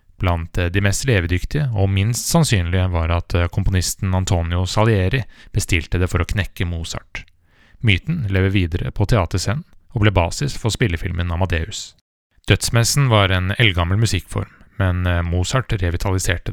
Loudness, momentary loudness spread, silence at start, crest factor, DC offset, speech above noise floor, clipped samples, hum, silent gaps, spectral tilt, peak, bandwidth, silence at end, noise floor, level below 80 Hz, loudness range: -19 LUFS; 9 LU; 0.2 s; 18 dB; under 0.1%; 33 dB; under 0.1%; none; 12.01-12.30 s; -5 dB/octave; 0 dBFS; 16.5 kHz; 0 s; -51 dBFS; -32 dBFS; 3 LU